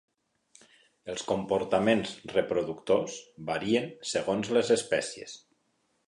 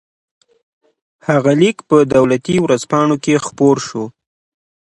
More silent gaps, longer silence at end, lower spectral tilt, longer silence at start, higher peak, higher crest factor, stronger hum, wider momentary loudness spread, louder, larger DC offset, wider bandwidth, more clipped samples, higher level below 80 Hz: neither; about the same, 0.7 s vs 0.8 s; second, -4.5 dB/octave vs -6 dB/octave; second, 1.05 s vs 1.3 s; second, -10 dBFS vs 0 dBFS; about the same, 20 dB vs 16 dB; neither; about the same, 14 LU vs 12 LU; second, -29 LUFS vs -14 LUFS; neither; about the same, 11.5 kHz vs 11.5 kHz; neither; second, -64 dBFS vs -52 dBFS